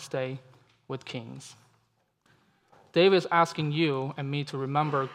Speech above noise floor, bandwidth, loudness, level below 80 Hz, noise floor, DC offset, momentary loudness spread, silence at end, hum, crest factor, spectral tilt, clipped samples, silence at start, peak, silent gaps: 44 dB; 12 kHz; -27 LUFS; -78 dBFS; -72 dBFS; under 0.1%; 20 LU; 0 s; none; 20 dB; -6 dB/octave; under 0.1%; 0 s; -8 dBFS; none